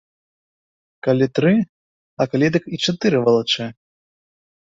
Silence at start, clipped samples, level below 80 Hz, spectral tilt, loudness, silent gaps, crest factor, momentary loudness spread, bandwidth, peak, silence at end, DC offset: 1.05 s; under 0.1%; -60 dBFS; -6 dB/octave; -19 LUFS; 1.69-2.17 s; 18 dB; 8 LU; 7.8 kHz; -4 dBFS; 0.95 s; under 0.1%